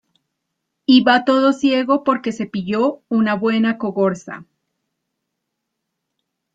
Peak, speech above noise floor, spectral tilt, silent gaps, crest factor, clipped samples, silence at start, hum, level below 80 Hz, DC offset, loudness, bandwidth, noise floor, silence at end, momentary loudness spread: -2 dBFS; 61 dB; -6 dB/octave; none; 18 dB; under 0.1%; 0.9 s; none; -64 dBFS; under 0.1%; -17 LUFS; 7.8 kHz; -77 dBFS; 2.1 s; 12 LU